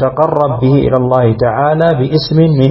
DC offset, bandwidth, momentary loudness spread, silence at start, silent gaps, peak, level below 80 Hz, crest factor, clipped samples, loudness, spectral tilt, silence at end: under 0.1%; 5.8 kHz; 2 LU; 0 s; none; 0 dBFS; -36 dBFS; 10 dB; 0.1%; -11 LUFS; -10 dB/octave; 0 s